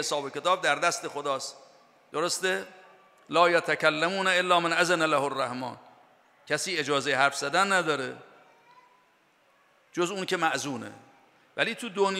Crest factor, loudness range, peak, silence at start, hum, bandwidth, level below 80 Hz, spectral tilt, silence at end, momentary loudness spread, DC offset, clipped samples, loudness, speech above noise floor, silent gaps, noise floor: 22 dB; 7 LU; -6 dBFS; 0 s; none; 15.5 kHz; -80 dBFS; -3 dB/octave; 0 s; 14 LU; under 0.1%; under 0.1%; -26 LUFS; 38 dB; none; -65 dBFS